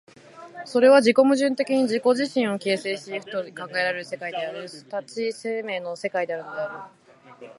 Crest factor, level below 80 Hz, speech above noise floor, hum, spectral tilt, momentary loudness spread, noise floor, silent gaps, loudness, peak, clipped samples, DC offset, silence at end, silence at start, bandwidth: 20 dB; -80 dBFS; 23 dB; none; -4.5 dB/octave; 16 LU; -46 dBFS; none; -23 LUFS; -4 dBFS; under 0.1%; under 0.1%; 0.05 s; 0.35 s; 11.5 kHz